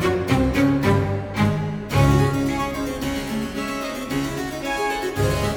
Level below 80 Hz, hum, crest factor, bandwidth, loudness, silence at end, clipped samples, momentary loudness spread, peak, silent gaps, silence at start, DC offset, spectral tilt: -34 dBFS; none; 16 dB; 19 kHz; -22 LUFS; 0 s; under 0.1%; 8 LU; -4 dBFS; none; 0 s; under 0.1%; -6 dB/octave